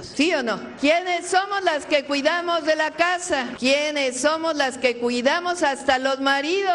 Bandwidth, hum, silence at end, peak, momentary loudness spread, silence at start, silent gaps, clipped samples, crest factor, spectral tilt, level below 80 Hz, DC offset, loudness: 11.5 kHz; none; 0 s; -4 dBFS; 3 LU; 0 s; none; under 0.1%; 18 dB; -2 dB/octave; -60 dBFS; under 0.1%; -21 LUFS